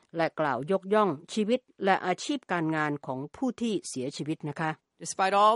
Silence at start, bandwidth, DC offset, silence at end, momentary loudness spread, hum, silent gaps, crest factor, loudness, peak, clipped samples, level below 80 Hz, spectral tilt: 0.15 s; 11.5 kHz; under 0.1%; 0 s; 8 LU; none; none; 20 dB; -29 LUFS; -8 dBFS; under 0.1%; -74 dBFS; -5 dB/octave